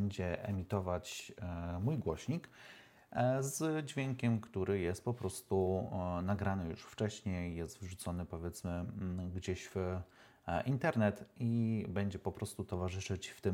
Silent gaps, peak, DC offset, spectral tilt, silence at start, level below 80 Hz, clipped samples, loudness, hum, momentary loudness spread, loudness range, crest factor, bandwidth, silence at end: none; -18 dBFS; under 0.1%; -6.5 dB/octave; 0 s; -64 dBFS; under 0.1%; -39 LUFS; none; 10 LU; 4 LU; 20 dB; 17 kHz; 0 s